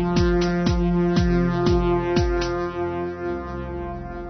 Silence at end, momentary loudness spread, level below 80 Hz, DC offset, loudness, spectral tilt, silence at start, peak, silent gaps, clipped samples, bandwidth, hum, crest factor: 0 s; 11 LU; -30 dBFS; under 0.1%; -23 LUFS; -7 dB/octave; 0 s; -8 dBFS; none; under 0.1%; 6.4 kHz; none; 14 dB